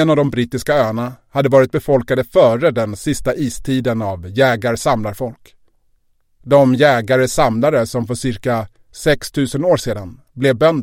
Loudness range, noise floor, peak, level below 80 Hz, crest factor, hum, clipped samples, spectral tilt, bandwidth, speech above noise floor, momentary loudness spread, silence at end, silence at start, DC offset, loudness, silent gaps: 3 LU; -58 dBFS; 0 dBFS; -40 dBFS; 16 dB; none; under 0.1%; -6 dB/octave; 16.5 kHz; 43 dB; 9 LU; 0 s; 0 s; under 0.1%; -16 LUFS; none